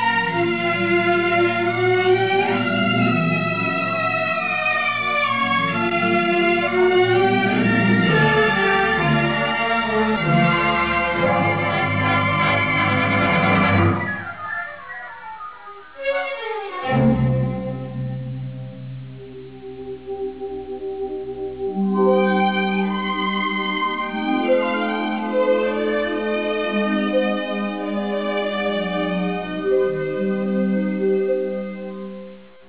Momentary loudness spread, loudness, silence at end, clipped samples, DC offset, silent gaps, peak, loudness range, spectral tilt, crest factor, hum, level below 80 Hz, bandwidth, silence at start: 14 LU; -19 LUFS; 0.25 s; under 0.1%; 0.4%; none; -6 dBFS; 7 LU; -9.5 dB/octave; 14 dB; none; -46 dBFS; 4 kHz; 0 s